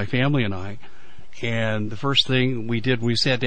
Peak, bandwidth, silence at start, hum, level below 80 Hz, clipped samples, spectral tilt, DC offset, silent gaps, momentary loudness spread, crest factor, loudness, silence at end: -6 dBFS; 9.2 kHz; 0 s; none; -56 dBFS; under 0.1%; -5.5 dB/octave; 4%; none; 13 LU; 18 dB; -22 LUFS; 0 s